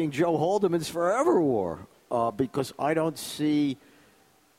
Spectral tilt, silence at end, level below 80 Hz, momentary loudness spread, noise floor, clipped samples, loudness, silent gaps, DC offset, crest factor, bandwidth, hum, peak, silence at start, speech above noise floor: -6 dB/octave; 0.85 s; -64 dBFS; 8 LU; -61 dBFS; under 0.1%; -27 LUFS; none; under 0.1%; 16 dB; 16 kHz; none; -10 dBFS; 0 s; 35 dB